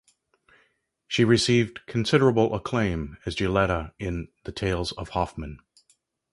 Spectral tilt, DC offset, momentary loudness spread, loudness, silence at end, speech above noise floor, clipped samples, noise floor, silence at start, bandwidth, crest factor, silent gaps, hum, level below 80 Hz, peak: -5.5 dB/octave; under 0.1%; 12 LU; -25 LUFS; 0.75 s; 44 dB; under 0.1%; -68 dBFS; 1.1 s; 11.5 kHz; 20 dB; none; none; -44 dBFS; -6 dBFS